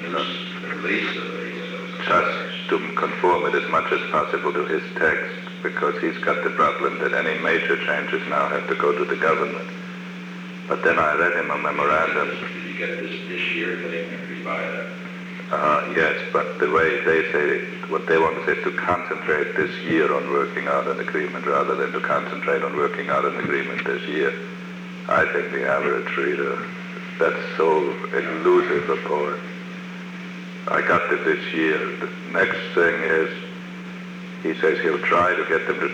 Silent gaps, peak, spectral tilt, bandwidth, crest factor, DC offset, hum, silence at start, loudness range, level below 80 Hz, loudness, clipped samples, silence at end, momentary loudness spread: none; -6 dBFS; -6 dB/octave; 10 kHz; 16 dB; under 0.1%; none; 0 s; 3 LU; -62 dBFS; -22 LUFS; under 0.1%; 0 s; 13 LU